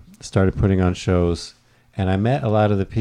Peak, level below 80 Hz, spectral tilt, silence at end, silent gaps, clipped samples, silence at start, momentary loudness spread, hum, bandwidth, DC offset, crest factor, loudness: -6 dBFS; -36 dBFS; -7.5 dB/octave; 0 s; none; under 0.1%; 0.25 s; 9 LU; none; 10.5 kHz; under 0.1%; 14 dB; -20 LUFS